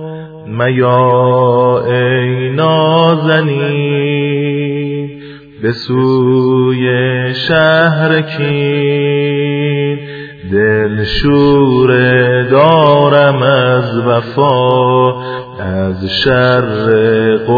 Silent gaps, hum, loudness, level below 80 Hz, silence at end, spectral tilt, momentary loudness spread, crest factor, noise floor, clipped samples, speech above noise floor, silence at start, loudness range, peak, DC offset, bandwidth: none; none; -11 LUFS; -36 dBFS; 0 s; -8.5 dB/octave; 9 LU; 10 dB; -31 dBFS; under 0.1%; 21 dB; 0 s; 5 LU; 0 dBFS; under 0.1%; 5 kHz